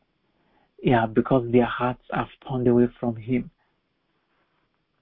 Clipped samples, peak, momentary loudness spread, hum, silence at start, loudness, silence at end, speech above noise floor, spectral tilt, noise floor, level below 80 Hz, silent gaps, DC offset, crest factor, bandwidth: under 0.1%; -6 dBFS; 10 LU; none; 0.8 s; -24 LUFS; 1.55 s; 50 dB; -12 dB/octave; -72 dBFS; -50 dBFS; none; under 0.1%; 20 dB; 4 kHz